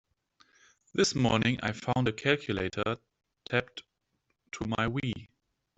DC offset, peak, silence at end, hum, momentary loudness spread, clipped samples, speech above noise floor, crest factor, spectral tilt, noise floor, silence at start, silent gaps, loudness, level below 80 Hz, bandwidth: under 0.1%; -10 dBFS; 0.5 s; none; 16 LU; under 0.1%; 49 dB; 22 dB; -5 dB/octave; -79 dBFS; 0.95 s; none; -30 LUFS; -58 dBFS; 8.2 kHz